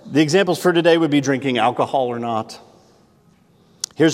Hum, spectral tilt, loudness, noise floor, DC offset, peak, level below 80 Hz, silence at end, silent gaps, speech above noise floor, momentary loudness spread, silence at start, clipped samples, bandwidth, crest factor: none; -5 dB/octave; -18 LUFS; -54 dBFS; under 0.1%; -2 dBFS; -70 dBFS; 0 s; none; 37 dB; 12 LU; 0.05 s; under 0.1%; 16 kHz; 18 dB